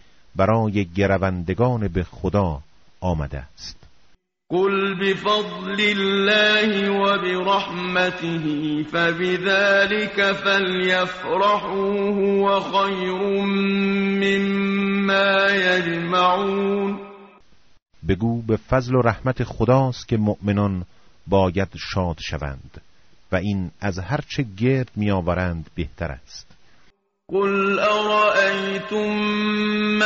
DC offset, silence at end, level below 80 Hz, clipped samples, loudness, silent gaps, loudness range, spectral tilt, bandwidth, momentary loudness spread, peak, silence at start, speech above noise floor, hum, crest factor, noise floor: under 0.1%; 0 s; -44 dBFS; under 0.1%; -21 LUFS; 17.82-17.86 s; 6 LU; -4 dB/octave; 7.6 kHz; 11 LU; -4 dBFS; 0.35 s; 35 dB; none; 18 dB; -56 dBFS